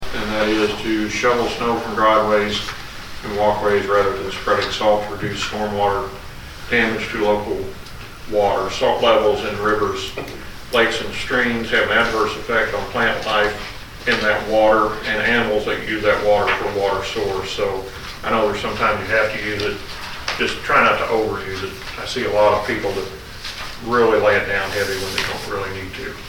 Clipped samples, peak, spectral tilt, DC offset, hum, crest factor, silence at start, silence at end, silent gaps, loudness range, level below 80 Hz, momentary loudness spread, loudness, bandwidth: under 0.1%; -2 dBFS; -4 dB/octave; under 0.1%; none; 18 dB; 0 s; 0 s; none; 3 LU; -38 dBFS; 13 LU; -19 LUFS; 19 kHz